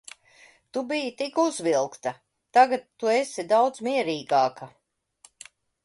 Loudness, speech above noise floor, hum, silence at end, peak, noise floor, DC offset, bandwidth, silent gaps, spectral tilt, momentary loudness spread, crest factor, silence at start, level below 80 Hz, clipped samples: -25 LUFS; 35 dB; none; 1.15 s; -6 dBFS; -59 dBFS; under 0.1%; 11.5 kHz; none; -3.5 dB/octave; 14 LU; 20 dB; 0.75 s; -74 dBFS; under 0.1%